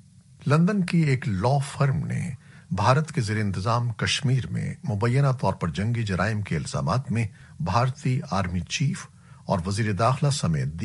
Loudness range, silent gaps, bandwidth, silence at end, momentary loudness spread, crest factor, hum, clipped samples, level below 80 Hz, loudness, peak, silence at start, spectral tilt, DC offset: 3 LU; none; 11.5 kHz; 0 s; 9 LU; 18 dB; none; under 0.1%; -50 dBFS; -25 LUFS; -6 dBFS; 0.4 s; -6 dB/octave; under 0.1%